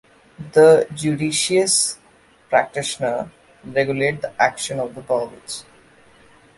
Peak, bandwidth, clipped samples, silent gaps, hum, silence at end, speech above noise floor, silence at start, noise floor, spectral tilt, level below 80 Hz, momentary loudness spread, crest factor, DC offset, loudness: -2 dBFS; 11.5 kHz; under 0.1%; none; none; 0.95 s; 34 dB; 0.4 s; -53 dBFS; -3.5 dB/octave; -58 dBFS; 18 LU; 18 dB; under 0.1%; -19 LUFS